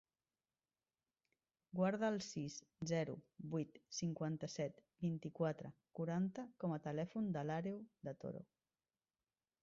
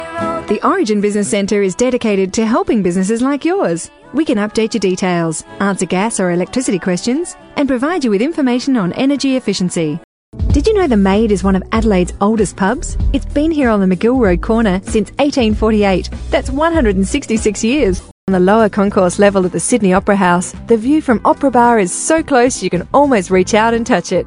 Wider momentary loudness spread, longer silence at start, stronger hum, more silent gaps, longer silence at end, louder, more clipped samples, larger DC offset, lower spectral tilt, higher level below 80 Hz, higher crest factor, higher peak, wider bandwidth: first, 10 LU vs 6 LU; first, 1.75 s vs 0 s; neither; second, none vs 10.04-10.32 s, 18.11-18.27 s; first, 1.2 s vs 0 s; second, -44 LUFS vs -14 LUFS; neither; neither; about the same, -6.5 dB/octave vs -5.5 dB/octave; second, -80 dBFS vs -28 dBFS; about the same, 18 dB vs 14 dB; second, -26 dBFS vs 0 dBFS; second, 7.6 kHz vs 11 kHz